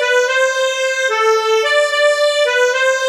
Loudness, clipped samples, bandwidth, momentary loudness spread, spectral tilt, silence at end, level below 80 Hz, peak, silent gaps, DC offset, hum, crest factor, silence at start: -14 LUFS; under 0.1%; 15.5 kHz; 3 LU; 3.5 dB/octave; 0 s; -74 dBFS; -2 dBFS; none; under 0.1%; none; 12 dB; 0 s